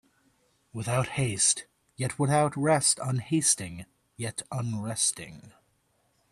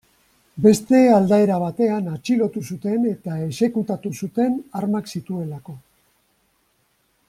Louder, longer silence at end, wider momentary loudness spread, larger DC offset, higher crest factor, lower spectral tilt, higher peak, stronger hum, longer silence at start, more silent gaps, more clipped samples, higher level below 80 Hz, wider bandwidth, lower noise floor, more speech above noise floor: second, -27 LUFS vs -20 LUFS; second, 0.85 s vs 1.5 s; about the same, 15 LU vs 14 LU; neither; about the same, 20 dB vs 18 dB; second, -3.5 dB/octave vs -7 dB/octave; second, -8 dBFS vs -2 dBFS; neither; first, 0.75 s vs 0.55 s; neither; neither; about the same, -62 dBFS vs -60 dBFS; second, 13.5 kHz vs 15 kHz; first, -71 dBFS vs -65 dBFS; about the same, 43 dB vs 46 dB